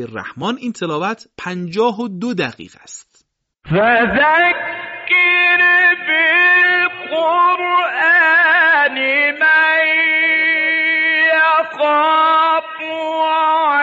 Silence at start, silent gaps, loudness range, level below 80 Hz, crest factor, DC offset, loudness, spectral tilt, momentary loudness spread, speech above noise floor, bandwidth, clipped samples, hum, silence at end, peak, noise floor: 0 s; none; 8 LU; -54 dBFS; 10 dB; under 0.1%; -13 LUFS; -1 dB/octave; 13 LU; 43 dB; 8 kHz; under 0.1%; none; 0 s; -4 dBFS; -60 dBFS